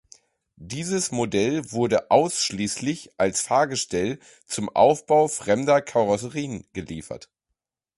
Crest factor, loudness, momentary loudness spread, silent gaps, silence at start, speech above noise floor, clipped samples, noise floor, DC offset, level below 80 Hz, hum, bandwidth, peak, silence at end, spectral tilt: 20 dB; -23 LUFS; 15 LU; none; 0.6 s; 59 dB; under 0.1%; -82 dBFS; under 0.1%; -56 dBFS; none; 11.5 kHz; -4 dBFS; 0.8 s; -4 dB/octave